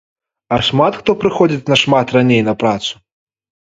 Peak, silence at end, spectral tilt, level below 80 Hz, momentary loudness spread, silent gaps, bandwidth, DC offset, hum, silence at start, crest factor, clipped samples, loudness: 0 dBFS; 0.85 s; -5.5 dB/octave; -48 dBFS; 8 LU; none; 8.2 kHz; under 0.1%; none; 0.5 s; 16 dB; under 0.1%; -14 LUFS